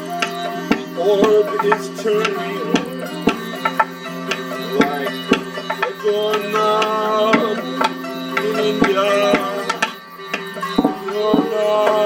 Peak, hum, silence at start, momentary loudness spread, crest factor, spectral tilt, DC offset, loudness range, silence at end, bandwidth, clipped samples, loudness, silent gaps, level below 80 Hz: 0 dBFS; none; 0 s; 8 LU; 18 dB; -4.5 dB/octave; under 0.1%; 3 LU; 0 s; 17.5 kHz; under 0.1%; -19 LUFS; none; -54 dBFS